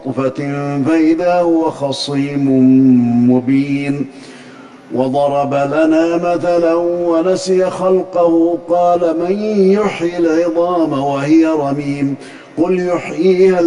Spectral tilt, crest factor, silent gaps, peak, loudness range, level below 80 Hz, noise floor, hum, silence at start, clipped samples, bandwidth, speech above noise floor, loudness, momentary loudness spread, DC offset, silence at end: -7 dB/octave; 12 dB; none; -2 dBFS; 2 LU; -52 dBFS; -36 dBFS; none; 0 s; under 0.1%; 11 kHz; 23 dB; -14 LUFS; 8 LU; under 0.1%; 0 s